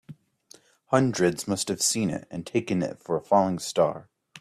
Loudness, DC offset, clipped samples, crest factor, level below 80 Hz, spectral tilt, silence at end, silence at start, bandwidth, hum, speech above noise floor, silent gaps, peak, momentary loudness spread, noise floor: -26 LUFS; under 0.1%; under 0.1%; 20 dB; -64 dBFS; -4.5 dB/octave; 0 s; 0.1 s; 15.5 kHz; none; 31 dB; none; -6 dBFS; 7 LU; -56 dBFS